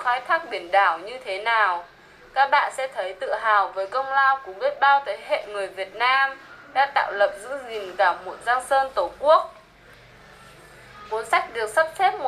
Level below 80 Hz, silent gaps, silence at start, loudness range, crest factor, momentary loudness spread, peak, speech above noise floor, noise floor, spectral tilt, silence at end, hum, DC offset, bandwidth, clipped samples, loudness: -62 dBFS; none; 0 s; 3 LU; 18 dB; 12 LU; -6 dBFS; 27 dB; -50 dBFS; -1.5 dB/octave; 0 s; none; under 0.1%; 13.5 kHz; under 0.1%; -22 LUFS